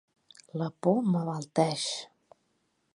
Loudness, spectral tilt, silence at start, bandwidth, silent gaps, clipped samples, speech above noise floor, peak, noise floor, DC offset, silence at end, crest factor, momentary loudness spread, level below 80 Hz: -30 LUFS; -5.5 dB/octave; 0.55 s; 11.5 kHz; none; under 0.1%; 46 dB; -10 dBFS; -75 dBFS; under 0.1%; 0.9 s; 20 dB; 12 LU; -78 dBFS